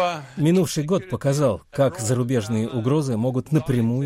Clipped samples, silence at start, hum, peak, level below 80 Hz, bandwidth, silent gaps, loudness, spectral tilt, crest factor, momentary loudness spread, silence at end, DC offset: under 0.1%; 0 s; none; -6 dBFS; -52 dBFS; 16 kHz; none; -22 LUFS; -6.5 dB/octave; 14 dB; 4 LU; 0 s; under 0.1%